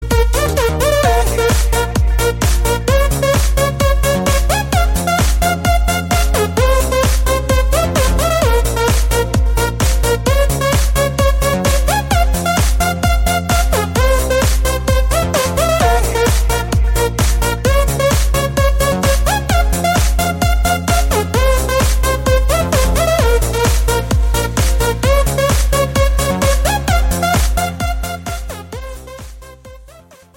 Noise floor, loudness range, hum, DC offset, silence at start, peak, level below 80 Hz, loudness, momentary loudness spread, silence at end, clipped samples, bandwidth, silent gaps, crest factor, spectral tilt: -41 dBFS; 1 LU; none; under 0.1%; 0 s; -2 dBFS; -16 dBFS; -15 LUFS; 2 LU; 0.5 s; under 0.1%; 17 kHz; none; 10 dB; -4.5 dB/octave